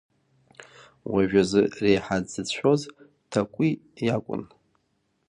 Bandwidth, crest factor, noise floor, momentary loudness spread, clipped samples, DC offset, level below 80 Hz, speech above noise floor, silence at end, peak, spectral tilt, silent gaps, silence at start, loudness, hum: 11 kHz; 20 dB; -72 dBFS; 11 LU; under 0.1%; under 0.1%; -56 dBFS; 48 dB; 0.85 s; -6 dBFS; -6 dB/octave; none; 0.6 s; -25 LUFS; none